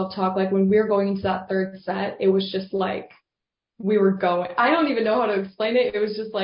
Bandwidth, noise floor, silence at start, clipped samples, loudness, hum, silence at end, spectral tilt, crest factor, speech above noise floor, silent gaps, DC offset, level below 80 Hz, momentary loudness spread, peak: 5.4 kHz; -87 dBFS; 0 s; under 0.1%; -22 LUFS; none; 0 s; -11 dB/octave; 14 dB; 65 dB; none; under 0.1%; -58 dBFS; 8 LU; -8 dBFS